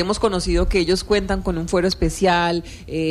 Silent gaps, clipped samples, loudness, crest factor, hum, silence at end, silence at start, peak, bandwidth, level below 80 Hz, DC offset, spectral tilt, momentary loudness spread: none; under 0.1%; -20 LUFS; 14 dB; none; 0 s; 0 s; -6 dBFS; 14.5 kHz; -28 dBFS; under 0.1%; -5 dB/octave; 6 LU